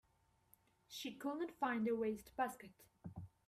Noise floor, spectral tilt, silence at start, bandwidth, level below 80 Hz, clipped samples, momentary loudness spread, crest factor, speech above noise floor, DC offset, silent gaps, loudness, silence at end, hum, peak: -77 dBFS; -5 dB/octave; 0.9 s; 15.5 kHz; -76 dBFS; under 0.1%; 18 LU; 18 dB; 34 dB; under 0.1%; none; -43 LUFS; 0.2 s; none; -28 dBFS